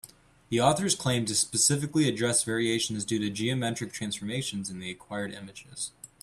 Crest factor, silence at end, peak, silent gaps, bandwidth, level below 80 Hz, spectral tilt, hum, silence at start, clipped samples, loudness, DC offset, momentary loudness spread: 20 dB; 0.15 s; -8 dBFS; none; 15 kHz; -62 dBFS; -3.5 dB/octave; none; 0.05 s; under 0.1%; -28 LUFS; under 0.1%; 13 LU